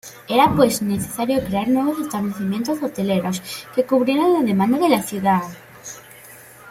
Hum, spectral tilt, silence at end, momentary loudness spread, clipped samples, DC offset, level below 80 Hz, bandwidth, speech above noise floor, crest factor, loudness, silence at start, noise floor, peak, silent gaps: none; -5.5 dB/octave; 0 s; 18 LU; under 0.1%; under 0.1%; -52 dBFS; 16.5 kHz; 24 dB; 18 dB; -19 LUFS; 0.05 s; -43 dBFS; -2 dBFS; none